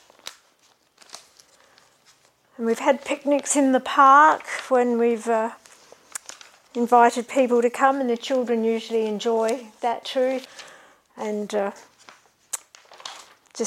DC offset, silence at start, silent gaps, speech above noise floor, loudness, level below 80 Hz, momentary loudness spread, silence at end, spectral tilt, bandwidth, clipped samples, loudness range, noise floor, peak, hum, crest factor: under 0.1%; 0.25 s; none; 41 dB; -21 LUFS; -78 dBFS; 22 LU; 0 s; -3 dB/octave; 15.5 kHz; under 0.1%; 10 LU; -61 dBFS; -4 dBFS; none; 20 dB